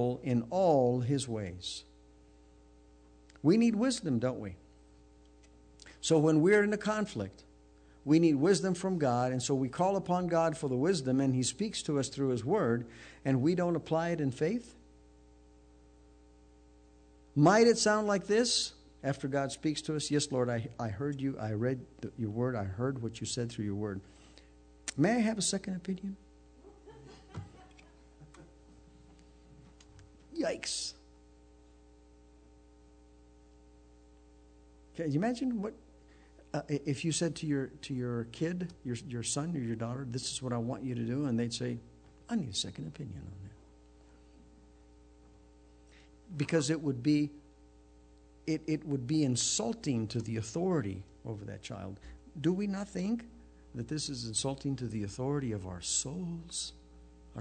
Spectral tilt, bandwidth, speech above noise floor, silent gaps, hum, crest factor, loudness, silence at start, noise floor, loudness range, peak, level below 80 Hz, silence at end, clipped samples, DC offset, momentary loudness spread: -5 dB/octave; 9.4 kHz; 28 dB; none; none; 20 dB; -32 LUFS; 0 s; -60 dBFS; 12 LU; -14 dBFS; -60 dBFS; 0 s; under 0.1%; under 0.1%; 16 LU